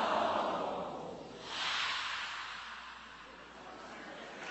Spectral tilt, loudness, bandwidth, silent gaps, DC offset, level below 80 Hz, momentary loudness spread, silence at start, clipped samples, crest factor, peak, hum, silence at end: -2.5 dB/octave; -38 LUFS; 8.2 kHz; none; under 0.1%; -70 dBFS; 17 LU; 0 s; under 0.1%; 20 dB; -20 dBFS; none; 0 s